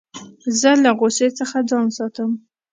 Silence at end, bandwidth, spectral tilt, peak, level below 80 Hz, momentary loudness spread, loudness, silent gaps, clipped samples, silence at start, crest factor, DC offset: 0.35 s; 9.6 kHz; -3 dB/octave; 0 dBFS; -70 dBFS; 14 LU; -18 LUFS; none; under 0.1%; 0.15 s; 18 dB; under 0.1%